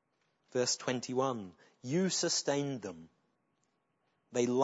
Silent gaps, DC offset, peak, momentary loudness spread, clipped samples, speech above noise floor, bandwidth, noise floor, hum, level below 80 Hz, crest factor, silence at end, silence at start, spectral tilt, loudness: none; under 0.1%; -14 dBFS; 16 LU; under 0.1%; 45 dB; 8 kHz; -79 dBFS; none; -82 dBFS; 22 dB; 0 s; 0.55 s; -3.5 dB/octave; -34 LUFS